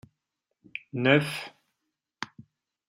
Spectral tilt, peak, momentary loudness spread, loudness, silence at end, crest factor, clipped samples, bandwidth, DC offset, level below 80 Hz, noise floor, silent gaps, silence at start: -6 dB/octave; -6 dBFS; 19 LU; -26 LUFS; 0.65 s; 26 dB; under 0.1%; 16 kHz; under 0.1%; -72 dBFS; -83 dBFS; none; 0.75 s